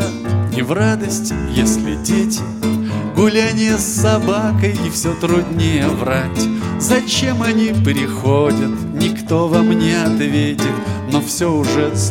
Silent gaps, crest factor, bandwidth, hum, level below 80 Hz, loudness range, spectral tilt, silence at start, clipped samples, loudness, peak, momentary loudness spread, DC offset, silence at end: none; 14 dB; 17 kHz; none; -36 dBFS; 1 LU; -5 dB/octave; 0 s; under 0.1%; -16 LUFS; 0 dBFS; 5 LU; 0.2%; 0 s